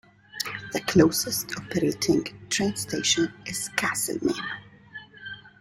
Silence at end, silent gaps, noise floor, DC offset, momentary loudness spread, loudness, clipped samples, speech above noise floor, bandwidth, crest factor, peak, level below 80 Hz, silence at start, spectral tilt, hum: 0.15 s; none; -46 dBFS; under 0.1%; 19 LU; -25 LUFS; under 0.1%; 20 dB; 16.5 kHz; 22 dB; -6 dBFS; -58 dBFS; 0.35 s; -3.5 dB/octave; none